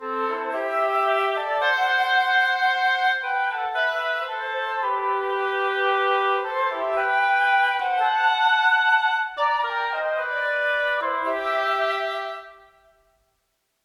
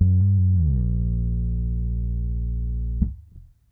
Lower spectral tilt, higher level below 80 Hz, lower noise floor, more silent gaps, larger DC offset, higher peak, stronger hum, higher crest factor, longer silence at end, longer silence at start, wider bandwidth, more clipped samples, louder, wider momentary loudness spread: second, -1 dB/octave vs -14.5 dB/octave; second, -66 dBFS vs -26 dBFS; first, -73 dBFS vs -47 dBFS; neither; neither; about the same, -8 dBFS vs -8 dBFS; neither; about the same, 14 dB vs 14 dB; first, 1.3 s vs 0.3 s; about the same, 0 s vs 0 s; first, 14 kHz vs 0.8 kHz; neither; about the same, -22 LUFS vs -24 LUFS; about the same, 7 LU vs 9 LU